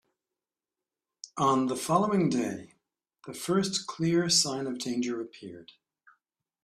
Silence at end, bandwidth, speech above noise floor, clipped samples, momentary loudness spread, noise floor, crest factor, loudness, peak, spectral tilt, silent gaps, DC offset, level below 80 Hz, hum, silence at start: 1 s; 14.5 kHz; over 62 dB; under 0.1%; 20 LU; under -90 dBFS; 20 dB; -28 LUFS; -10 dBFS; -4 dB/octave; none; under 0.1%; -70 dBFS; none; 1.25 s